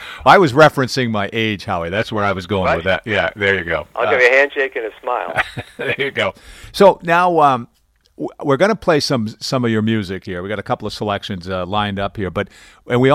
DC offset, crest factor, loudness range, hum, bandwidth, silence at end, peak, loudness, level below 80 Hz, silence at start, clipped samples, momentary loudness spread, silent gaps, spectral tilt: under 0.1%; 16 dB; 5 LU; none; 15.5 kHz; 0 s; 0 dBFS; -17 LUFS; -46 dBFS; 0 s; under 0.1%; 13 LU; none; -5.5 dB/octave